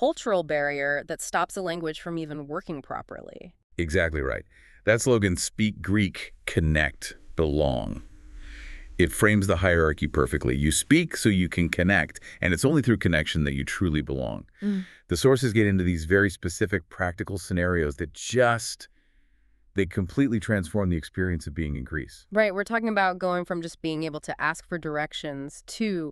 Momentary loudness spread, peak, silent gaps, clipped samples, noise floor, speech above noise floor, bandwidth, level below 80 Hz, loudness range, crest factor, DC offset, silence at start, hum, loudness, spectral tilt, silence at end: 12 LU; -4 dBFS; 3.64-3.70 s; under 0.1%; -61 dBFS; 35 dB; 13.5 kHz; -40 dBFS; 5 LU; 22 dB; under 0.1%; 0 s; none; -26 LUFS; -5.5 dB/octave; 0 s